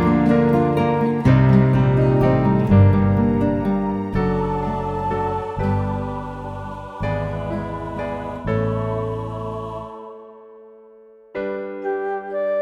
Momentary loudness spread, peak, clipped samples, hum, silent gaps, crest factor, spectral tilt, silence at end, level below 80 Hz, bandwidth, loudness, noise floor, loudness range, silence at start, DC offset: 15 LU; -2 dBFS; under 0.1%; none; none; 18 dB; -10 dB/octave; 0 s; -36 dBFS; 6 kHz; -20 LUFS; -47 dBFS; 12 LU; 0 s; under 0.1%